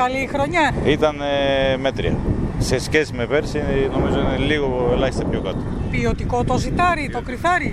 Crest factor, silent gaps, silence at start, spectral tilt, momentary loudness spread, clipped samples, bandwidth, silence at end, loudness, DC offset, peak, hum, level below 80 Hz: 16 dB; none; 0 s; -6 dB/octave; 5 LU; under 0.1%; 14.5 kHz; 0 s; -20 LUFS; under 0.1%; -2 dBFS; none; -30 dBFS